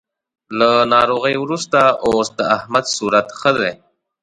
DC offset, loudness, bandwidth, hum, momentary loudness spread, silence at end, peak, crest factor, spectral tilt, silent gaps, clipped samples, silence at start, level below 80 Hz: under 0.1%; -16 LUFS; 11 kHz; none; 6 LU; 0.5 s; 0 dBFS; 16 dB; -3.5 dB/octave; none; under 0.1%; 0.5 s; -54 dBFS